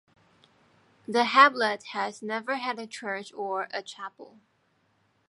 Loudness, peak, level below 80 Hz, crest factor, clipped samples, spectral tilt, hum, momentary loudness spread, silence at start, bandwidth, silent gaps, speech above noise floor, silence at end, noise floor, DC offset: -26 LUFS; -4 dBFS; -84 dBFS; 26 dB; under 0.1%; -3 dB/octave; none; 20 LU; 1.1 s; 11.5 kHz; none; 43 dB; 1.05 s; -70 dBFS; under 0.1%